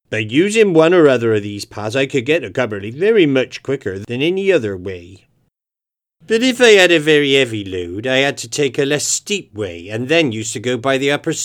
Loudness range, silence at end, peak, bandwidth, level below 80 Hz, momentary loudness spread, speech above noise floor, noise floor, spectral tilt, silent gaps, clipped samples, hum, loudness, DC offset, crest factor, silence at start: 4 LU; 0 s; 0 dBFS; 15.5 kHz; -58 dBFS; 14 LU; 72 dB; -87 dBFS; -4 dB/octave; none; under 0.1%; none; -15 LUFS; under 0.1%; 16 dB; 0.1 s